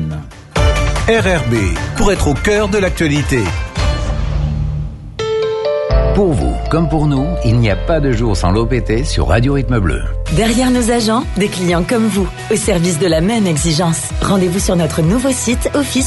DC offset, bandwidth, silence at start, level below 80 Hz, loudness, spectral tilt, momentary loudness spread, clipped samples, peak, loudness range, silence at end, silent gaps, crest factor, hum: under 0.1%; 12 kHz; 0 s; -20 dBFS; -15 LUFS; -5.5 dB/octave; 5 LU; under 0.1%; 0 dBFS; 2 LU; 0 s; none; 14 dB; none